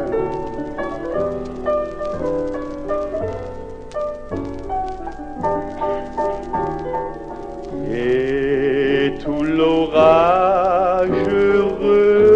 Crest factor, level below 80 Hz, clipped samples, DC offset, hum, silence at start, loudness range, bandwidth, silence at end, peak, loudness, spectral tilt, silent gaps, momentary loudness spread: 18 dB; -38 dBFS; under 0.1%; under 0.1%; none; 0 s; 10 LU; 8.2 kHz; 0 s; 0 dBFS; -19 LUFS; -7 dB/octave; none; 14 LU